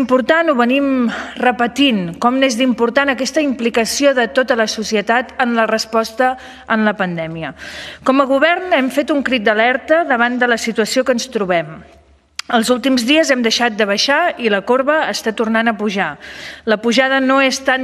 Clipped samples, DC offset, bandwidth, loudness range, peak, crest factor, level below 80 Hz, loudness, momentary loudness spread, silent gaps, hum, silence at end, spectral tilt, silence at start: under 0.1%; under 0.1%; 13.5 kHz; 2 LU; 0 dBFS; 16 dB; -54 dBFS; -15 LUFS; 7 LU; none; none; 0 s; -3.5 dB/octave; 0 s